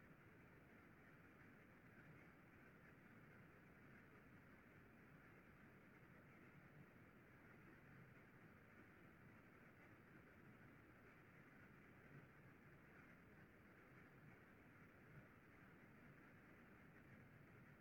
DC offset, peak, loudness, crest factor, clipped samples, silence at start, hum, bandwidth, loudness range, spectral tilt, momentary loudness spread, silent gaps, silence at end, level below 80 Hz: under 0.1%; -52 dBFS; -67 LUFS; 14 dB; under 0.1%; 0 s; none; 18 kHz; 0 LU; -7 dB/octave; 2 LU; none; 0 s; -82 dBFS